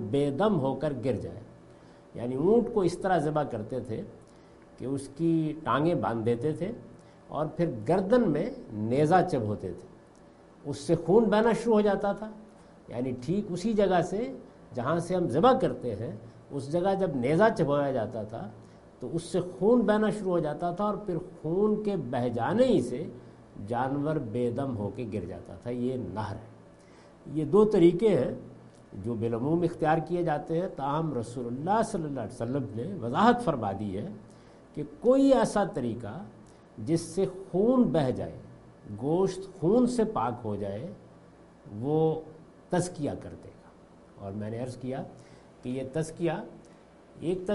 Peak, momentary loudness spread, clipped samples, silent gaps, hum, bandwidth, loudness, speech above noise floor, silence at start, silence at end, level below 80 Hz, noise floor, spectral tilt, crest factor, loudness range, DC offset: -8 dBFS; 17 LU; under 0.1%; none; none; 11.5 kHz; -28 LUFS; 26 dB; 0 s; 0 s; -56 dBFS; -54 dBFS; -7 dB/octave; 22 dB; 6 LU; under 0.1%